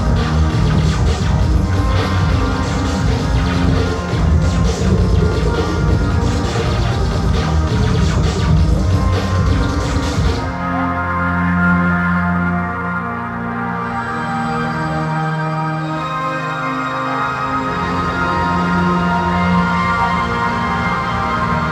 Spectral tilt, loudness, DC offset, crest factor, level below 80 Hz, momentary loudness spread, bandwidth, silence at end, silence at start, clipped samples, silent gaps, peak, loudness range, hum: -6.5 dB/octave; -17 LUFS; under 0.1%; 14 dB; -22 dBFS; 5 LU; 12 kHz; 0 s; 0 s; under 0.1%; none; -2 dBFS; 3 LU; none